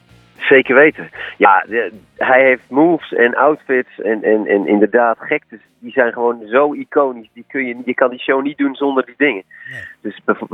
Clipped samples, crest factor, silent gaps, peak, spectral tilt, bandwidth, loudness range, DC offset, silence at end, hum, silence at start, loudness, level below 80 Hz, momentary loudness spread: under 0.1%; 16 dB; none; 0 dBFS; -7.5 dB/octave; 4 kHz; 5 LU; under 0.1%; 0.05 s; none; 0.4 s; -15 LUFS; -64 dBFS; 14 LU